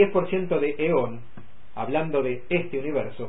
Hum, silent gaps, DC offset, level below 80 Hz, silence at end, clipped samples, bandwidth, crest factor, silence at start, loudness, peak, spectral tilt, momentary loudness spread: none; none; 3%; -58 dBFS; 0 s; under 0.1%; 4 kHz; 18 dB; 0 s; -26 LUFS; -8 dBFS; -11 dB/octave; 10 LU